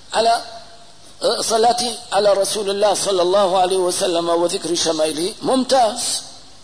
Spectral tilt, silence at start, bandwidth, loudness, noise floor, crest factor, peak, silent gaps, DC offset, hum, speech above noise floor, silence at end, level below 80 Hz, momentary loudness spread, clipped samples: -2.5 dB/octave; 0.1 s; 11 kHz; -18 LUFS; -45 dBFS; 12 dB; -6 dBFS; none; 0.8%; none; 27 dB; 0.25 s; -58 dBFS; 6 LU; under 0.1%